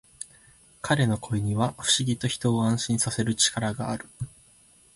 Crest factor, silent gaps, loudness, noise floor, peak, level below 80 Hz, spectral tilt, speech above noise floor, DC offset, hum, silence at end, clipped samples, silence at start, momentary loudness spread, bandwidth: 18 dB; none; -25 LUFS; -57 dBFS; -8 dBFS; -54 dBFS; -4 dB/octave; 32 dB; under 0.1%; none; 0.65 s; under 0.1%; 0.2 s; 17 LU; 11.5 kHz